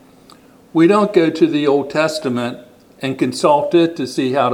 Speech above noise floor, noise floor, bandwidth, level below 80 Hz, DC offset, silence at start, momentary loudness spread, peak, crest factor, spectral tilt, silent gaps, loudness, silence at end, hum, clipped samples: 30 dB; -45 dBFS; 12.5 kHz; -62 dBFS; under 0.1%; 0.75 s; 11 LU; 0 dBFS; 16 dB; -6 dB/octave; none; -16 LUFS; 0 s; none; under 0.1%